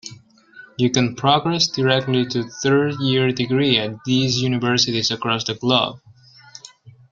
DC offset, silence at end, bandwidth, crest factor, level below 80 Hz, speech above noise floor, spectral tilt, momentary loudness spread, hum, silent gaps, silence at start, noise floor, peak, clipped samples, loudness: under 0.1%; 0.2 s; 7.6 kHz; 20 dB; -56 dBFS; 29 dB; -4.5 dB/octave; 7 LU; none; none; 0.05 s; -48 dBFS; -2 dBFS; under 0.1%; -19 LUFS